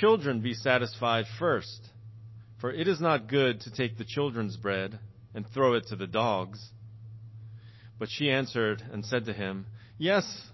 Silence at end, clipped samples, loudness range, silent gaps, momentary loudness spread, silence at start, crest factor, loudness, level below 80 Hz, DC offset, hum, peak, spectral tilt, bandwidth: 0 s; under 0.1%; 3 LU; none; 21 LU; 0 s; 22 dB; -29 LUFS; -64 dBFS; under 0.1%; none; -8 dBFS; -6 dB/octave; 6.2 kHz